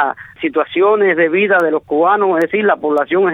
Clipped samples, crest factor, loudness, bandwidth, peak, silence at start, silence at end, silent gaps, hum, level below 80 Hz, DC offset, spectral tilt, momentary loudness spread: under 0.1%; 12 dB; -14 LUFS; 4.8 kHz; -2 dBFS; 0 s; 0 s; none; none; -60 dBFS; under 0.1%; -7 dB/octave; 6 LU